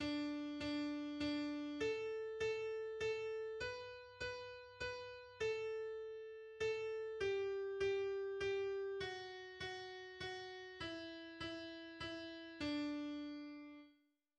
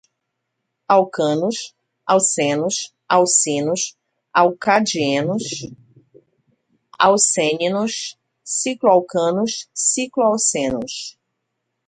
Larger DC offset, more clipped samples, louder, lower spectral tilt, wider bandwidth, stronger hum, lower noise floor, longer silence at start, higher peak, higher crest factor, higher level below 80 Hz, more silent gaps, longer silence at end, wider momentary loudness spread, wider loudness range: neither; neither; second, -45 LUFS vs -18 LUFS; first, -4.5 dB/octave vs -3 dB/octave; about the same, 10 kHz vs 9.6 kHz; neither; about the same, -76 dBFS vs -77 dBFS; second, 0 s vs 0.9 s; second, -30 dBFS vs 0 dBFS; second, 14 dB vs 20 dB; second, -70 dBFS vs -62 dBFS; neither; second, 0.45 s vs 0.8 s; second, 10 LU vs 13 LU; about the same, 5 LU vs 3 LU